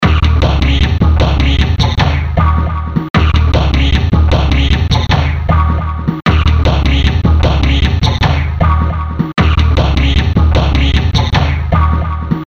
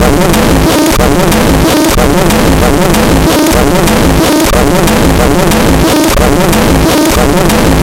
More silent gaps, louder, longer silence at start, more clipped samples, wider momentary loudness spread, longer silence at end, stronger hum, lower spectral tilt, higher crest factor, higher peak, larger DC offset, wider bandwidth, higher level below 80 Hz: first, 3.10-3.14 s vs none; second, -12 LUFS vs -7 LUFS; about the same, 0 s vs 0 s; second, under 0.1% vs 0.2%; first, 4 LU vs 0 LU; about the same, 0.05 s vs 0 s; neither; first, -6.5 dB/octave vs -5 dB/octave; about the same, 10 dB vs 6 dB; about the same, 0 dBFS vs 0 dBFS; first, 0.2% vs under 0.1%; second, 6.8 kHz vs 17.5 kHz; about the same, -14 dBFS vs -14 dBFS